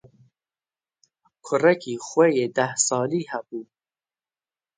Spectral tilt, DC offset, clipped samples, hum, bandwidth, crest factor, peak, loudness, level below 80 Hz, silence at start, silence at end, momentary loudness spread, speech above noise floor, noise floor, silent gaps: -4 dB/octave; under 0.1%; under 0.1%; none; 9.6 kHz; 20 dB; -4 dBFS; -22 LUFS; -74 dBFS; 1.45 s; 1.15 s; 13 LU; over 68 dB; under -90 dBFS; none